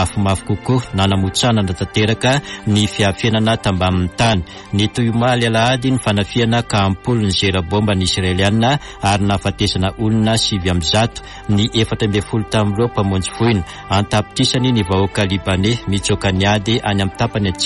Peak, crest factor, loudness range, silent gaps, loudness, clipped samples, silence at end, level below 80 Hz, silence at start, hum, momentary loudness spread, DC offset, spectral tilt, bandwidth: -4 dBFS; 12 dB; 1 LU; none; -16 LUFS; under 0.1%; 0 s; -36 dBFS; 0 s; none; 4 LU; under 0.1%; -5 dB/octave; 11.5 kHz